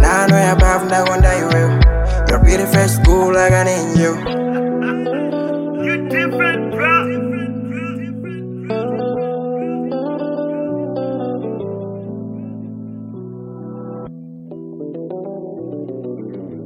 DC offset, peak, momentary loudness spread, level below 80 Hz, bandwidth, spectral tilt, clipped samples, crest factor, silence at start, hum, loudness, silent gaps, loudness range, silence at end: under 0.1%; 0 dBFS; 18 LU; -22 dBFS; 16 kHz; -6 dB/octave; under 0.1%; 16 dB; 0 s; none; -17 LUFS; none; 16 LU; 0 s